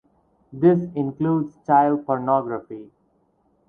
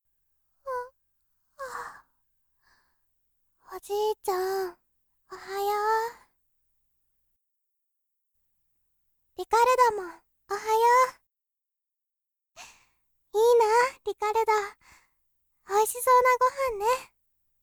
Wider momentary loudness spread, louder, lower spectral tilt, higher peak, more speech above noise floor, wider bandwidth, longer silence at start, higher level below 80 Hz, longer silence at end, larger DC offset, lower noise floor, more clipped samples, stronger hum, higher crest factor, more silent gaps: second, 14 LU vs 21 LU; first, -21 LUFS vs -25 LUFS; first, -11 dB/octave vs -1.5 dB/octave; first, -4 dBFS vs -10 dBFS; second, 44 dB vs 58 dB; second, 3.8 kHz vs over 20 kHz; second, 0.5 s vs 0.65 s; about the same, -62 dBFS vs -66 dBFS; first, 0.85 s vs 0.6 s; neither; second, -65 dBFS vs -87 dBFS; neither; neither; about the same, 18 dB vs 20 dB; neither